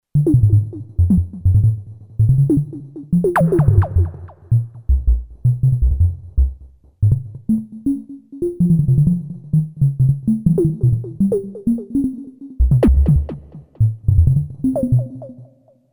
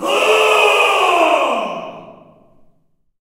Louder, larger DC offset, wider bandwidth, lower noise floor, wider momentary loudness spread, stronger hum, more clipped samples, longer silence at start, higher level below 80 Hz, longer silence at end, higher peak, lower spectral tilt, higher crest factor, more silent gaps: second, -18 LUFS vs -13 LUFS; neither; second, 11 kHz vs 16 kHz; second, -48 dBFS vs -58 dBFS; second, 11 LU vs 15 LU; neither; neither; first, 0.15 s vs 0 s; first, -24 dBFS vs -64 dBFS; second, 0.5 s vs 1.1 s; about the same, -2 dBFS vs 0 dBFS; first, -11 dB/octave vs -1.5 dB/octave; about the same, 14 dB vs 16 dB; neither